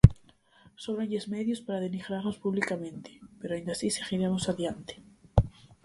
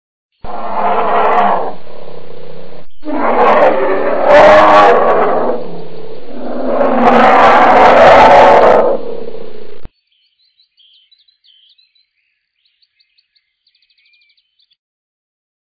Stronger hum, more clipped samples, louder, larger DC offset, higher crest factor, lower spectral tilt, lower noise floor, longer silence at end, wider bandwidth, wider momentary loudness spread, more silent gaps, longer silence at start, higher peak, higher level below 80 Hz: neither; second, under 0.1% vs 3%; second, -31 LUFS vs -8 LUFS; neither; first, 28 dB vs 12 dB; about the same, -6.5 dB/octave vs -5.5 dB/octave; second, -60 dBFS vs -65 dBFS; second, 0.35 s vs 0.9 s; first, 11.5 kHz vs 8 kHz; second, 14 LU vs 24 LU; neither; second, 0.05 s vs 0.3 s; about the same, 0 dBFS vs 0 dBFS; about the same, -38 dBFS vs -42 dBFS